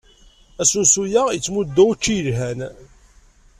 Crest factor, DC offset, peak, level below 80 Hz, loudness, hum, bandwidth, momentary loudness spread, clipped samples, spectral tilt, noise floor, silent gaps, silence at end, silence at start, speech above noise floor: 18 dB; under 0.1%; -2 dBFS; -46 dBFS; -17 LUFS; none; 14.5 kHz; 12 LU; under 0.1%; -3.5 dB/octave; -51 dBFS; none; 0.75 s; 0.6 s; 32 dB